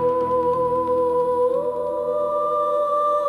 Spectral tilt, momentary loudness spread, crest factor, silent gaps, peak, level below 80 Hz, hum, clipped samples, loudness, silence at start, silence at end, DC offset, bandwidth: -7.5 dB/octave; 3 LU; 10 dB; none; -12 dBFS; -58 dBFS; none; under 0.1%; -21 LUFS; 0 s; 0 s; under 0.1%; 11.5 kHz